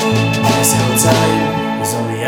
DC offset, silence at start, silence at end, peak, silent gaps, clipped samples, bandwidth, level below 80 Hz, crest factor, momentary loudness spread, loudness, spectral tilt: under 0.1%; 0 s; 0 s; 0 dBFS; none; under 0.1%; 19.5 kHz; -42 dBFS; 14 dB; 6 LU; -13 LUFS; -4 dB/octave